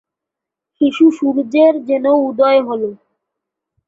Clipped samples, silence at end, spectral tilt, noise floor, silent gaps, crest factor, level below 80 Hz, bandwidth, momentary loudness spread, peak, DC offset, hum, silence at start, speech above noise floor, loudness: under 0.1%; 0.95 s; -6 dB/octave; -83 dBFS; none; 14 dB; -62 dBFS; 7.6 kHz; 8 LU; -2 dBFS; under 0.1%; none; 0.8 s; 70 dB; -14 LUFS